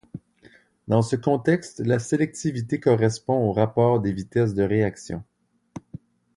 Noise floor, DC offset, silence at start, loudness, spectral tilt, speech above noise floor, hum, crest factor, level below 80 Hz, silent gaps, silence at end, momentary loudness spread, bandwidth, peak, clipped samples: -55 dBFS; under 0.1%; 0.15 s; -23 LUFS; -7 dB/octave; 33 dB; none; 18 dB; -52 dBFS; none; 0.6 s; 19 LU; 11.5 kHz; -6 dBFS; under 0.1%